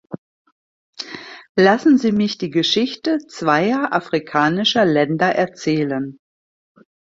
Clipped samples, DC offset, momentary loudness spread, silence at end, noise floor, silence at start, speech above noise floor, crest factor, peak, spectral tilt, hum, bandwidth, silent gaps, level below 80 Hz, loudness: under 0.1%; under 0.1%; 16 LU; 0.95 s; under -90 dBFS; 0.1 s; over 73 dB; 18 dB; -2 dBFS; -5.5 dB/octave; none; 7.8 kHz; 0.18-0.45 s, 0.52-0.93 s, 1.49-1.55 s; -60 dBFS; -18 LUFS